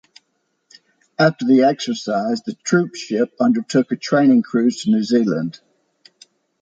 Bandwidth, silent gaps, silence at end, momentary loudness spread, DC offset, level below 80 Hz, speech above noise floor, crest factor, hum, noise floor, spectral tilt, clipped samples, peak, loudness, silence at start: 7.8 kHz; none; 1.05 s; 9 LU; under 0.1%; -68 dBFS; 53 dB; 16 dB; none; -70 dBFS; -5.5 dB/octave; under 0.1%; -2 dBFS; -18 LUFS; 1.2 s